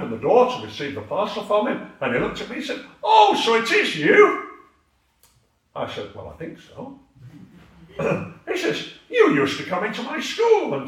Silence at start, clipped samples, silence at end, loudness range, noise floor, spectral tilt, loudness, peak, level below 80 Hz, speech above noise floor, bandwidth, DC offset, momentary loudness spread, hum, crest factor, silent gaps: 0 s; under 0.1%; 0 s; 15 LU; -64 dBFS; -4.5 dB/octave; -20 LUFS; -2 dBFS; -58 dBFS; 43 dB; 13.5 kHz; under 0.1%; 21 LU; none; 20 dB; none